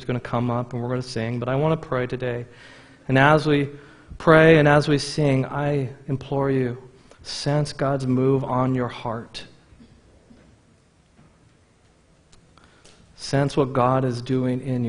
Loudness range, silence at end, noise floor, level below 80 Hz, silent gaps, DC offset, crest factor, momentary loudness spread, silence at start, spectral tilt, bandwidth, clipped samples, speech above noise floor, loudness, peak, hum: 11 LU; 0 s; -58 dBFS; -50 dBFS; none; under 0.1%; 22 dB; 14 LU; 0 s; -6.5 dB/octave; 10.5 kHz; under 0.1%; 36 dB; -22 LUFS; 0 dBFS; none